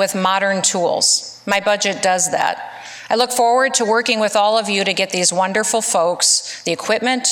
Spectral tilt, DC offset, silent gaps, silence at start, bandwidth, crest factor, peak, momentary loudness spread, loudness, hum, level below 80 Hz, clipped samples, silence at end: -1.5 dB/octave; under 0.1%; none; 0 s; 17 kHz; 16 dB; -2 dBFS; 6 LU; -16 LUFS; none; -66 dBFS; under 0.1%; 0 s